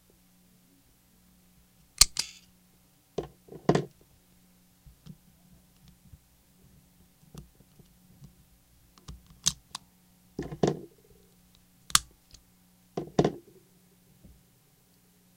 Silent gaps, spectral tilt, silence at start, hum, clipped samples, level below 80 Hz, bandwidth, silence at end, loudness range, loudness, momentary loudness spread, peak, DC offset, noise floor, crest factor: none; -2.5 dB/octave; 2 s; 60 Hz at -65 dBFS; under 0.1%; -54 dBFS; 16.5 kHz; 2 s; 9 LU; -29 LUFS; 31 LU; 0 dBFS; under 0.1%; -63 dBFS; 36 dB